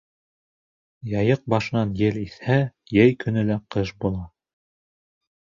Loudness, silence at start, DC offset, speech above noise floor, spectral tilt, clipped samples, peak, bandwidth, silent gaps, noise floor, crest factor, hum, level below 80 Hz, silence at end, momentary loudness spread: -23 LUFS; 1.05 s; under 0.1%; over 68 dB; -8 dB/octave; under 0.1%; -4 dBFS; 7.4 kHz; none; under -90 dBFS; 20 dB; none; -48 dBFS; 1.3 s; 11 LU